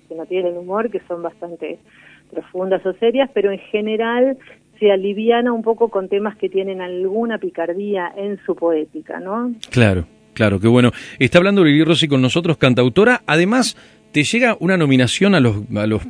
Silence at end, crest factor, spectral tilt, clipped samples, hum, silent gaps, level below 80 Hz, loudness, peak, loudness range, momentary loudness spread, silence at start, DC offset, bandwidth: 0 s; 16 dB; -6 dB/octave; under 0.1%; none; none; -48 dBFS; -17 LUFS; 0 dBFS; 7 LU; 12 LU; 0.1 s; under 0.1%; 11 kHz